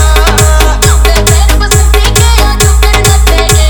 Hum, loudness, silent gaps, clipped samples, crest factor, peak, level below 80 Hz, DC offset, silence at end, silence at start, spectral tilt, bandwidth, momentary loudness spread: none; -6 LUFS; none; 1%; 4 dB; 0 dBFS; -6 dBFS; under 0.1%; 0 s; 0 s; -3.5 dB/octave; over 20 kHz; 1 LU